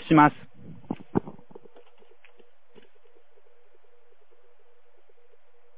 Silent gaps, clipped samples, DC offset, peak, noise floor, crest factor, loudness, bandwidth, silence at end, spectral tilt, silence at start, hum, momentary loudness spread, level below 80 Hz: none; under 0.1%; 0.8%; -2 dBFS; -64 dBFS; 28 dB; -24 LUFS; 4 kHz; 4.45 s; -6 dB/octave; 0.05 s; 50 Hz at -75 dBFS; 32 LU; -64 dBFS